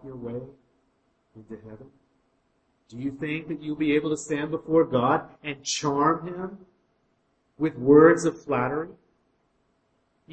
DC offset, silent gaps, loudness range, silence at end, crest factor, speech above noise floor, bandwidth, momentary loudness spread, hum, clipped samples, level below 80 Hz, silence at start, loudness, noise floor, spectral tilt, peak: under 0.1%; none; 14 LU; 1.4 s; 22 dB; 45 dB; 8.8 kHz; 20 LU; none; under 0.1%; -62 dBFS; 0.05 s; -24 LUFS; -70 dBFS; -5.5 dB/octave; -4 dBFS